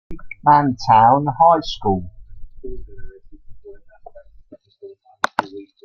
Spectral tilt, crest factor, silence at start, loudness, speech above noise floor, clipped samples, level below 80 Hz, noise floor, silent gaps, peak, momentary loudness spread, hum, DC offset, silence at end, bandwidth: -6.5 dB/octave; 20 dB; 0.1 s; -16 LUFS; 31 dB; under 0.1%; -40 dBFS; -46 dBFS; none; 0 dBFS; 24 LU; none; under 0.1%; 0.2 s; 9.6 kHz